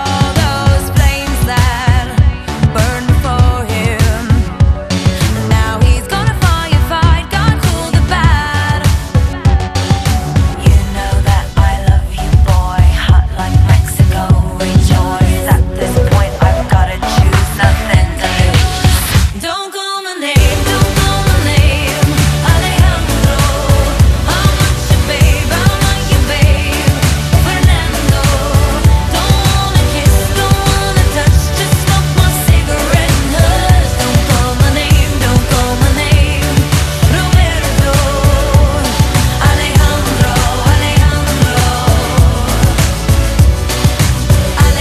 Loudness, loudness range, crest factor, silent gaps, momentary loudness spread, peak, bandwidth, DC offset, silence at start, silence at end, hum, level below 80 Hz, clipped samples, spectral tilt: -11 LUFS; 2 LU; 10 dB; none; 3 LU; 0 dBFS; 14.5 kHz; under 0.1%; 0 s; 0 s; none; -14 dBFS; 0.3%; -5 dB/octave